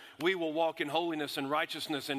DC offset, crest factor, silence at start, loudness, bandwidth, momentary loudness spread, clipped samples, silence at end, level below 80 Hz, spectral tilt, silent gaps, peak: under 0.1%; 18 dB; 0 s; -33 LUFS; 15.5 kHz; 4 LU; under 0.1%; 0 s; -82 dBFS; -4 dB/octave; none; -16 dBFS